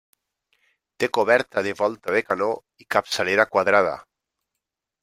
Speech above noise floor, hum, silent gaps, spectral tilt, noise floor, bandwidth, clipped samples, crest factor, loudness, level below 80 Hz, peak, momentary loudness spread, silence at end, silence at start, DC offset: 62 dB; none; none; -4 dB/octave; -84 dBFS; 16 kHz; under 0.1%; 22 dB; -22 LUFS; -68 dBFS; -2 dBFS; 8 LU; 1 s; 1 s; under 0.1%